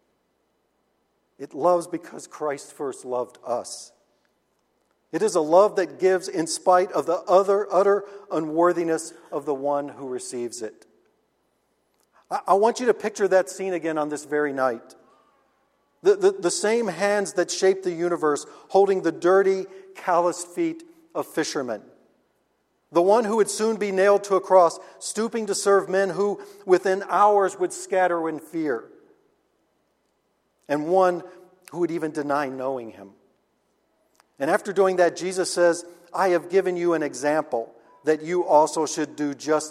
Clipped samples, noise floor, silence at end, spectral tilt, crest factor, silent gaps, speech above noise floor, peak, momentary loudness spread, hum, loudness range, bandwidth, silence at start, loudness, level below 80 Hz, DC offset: under 0.1%; -70 dBFS; 0 s; -4 dB/octave; 20 dB; none; 48 dB; -4 dBFS; 13 LU; none; 7 LU; 14 kHz; 1.4 s; -23 LUFS; -76 dBFS; under 0.1%